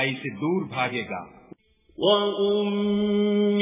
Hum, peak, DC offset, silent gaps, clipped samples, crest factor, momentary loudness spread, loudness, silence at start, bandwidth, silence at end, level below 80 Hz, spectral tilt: none; -8 dBFS; under 0.1%; none; under 0.1%; 16 dB; 8 LU; -24 LUFS; 0 s; 3.8 kHz; 0 s; -62 dBFS; -10 dB/octave